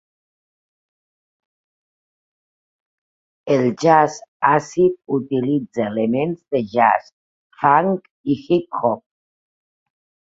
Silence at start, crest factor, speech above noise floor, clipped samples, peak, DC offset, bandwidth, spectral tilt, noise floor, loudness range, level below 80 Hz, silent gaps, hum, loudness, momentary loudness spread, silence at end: 3.45 s; 20 dB; over 72 dB; under 0.1%; 0 dBFS; under 0.1%; 7.8 kHz; -6.5 dB/octave; under -90 dBFS; 3 LU; -64 dBFS; 4.28-4.40 s, 7.13-7.50 s, 8.11-8.24 s; none; -19 LUFS; 9 LU; 1.3 s